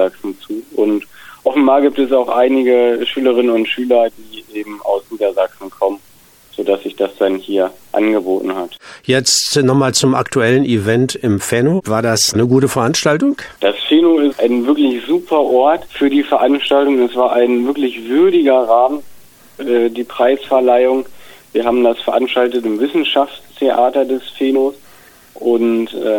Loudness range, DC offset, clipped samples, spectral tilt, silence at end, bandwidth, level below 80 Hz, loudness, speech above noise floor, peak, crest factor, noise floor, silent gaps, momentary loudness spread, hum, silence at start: 5 LU; under 0.1%; under 0.1%; -4.5 dB/octave; 0 s; 19 kHz; -56 dBFS; -14 LUFS; 32 dB; 0 dBFS; 14 dB; -46 dBFS; none; 9 LU; none; 0 s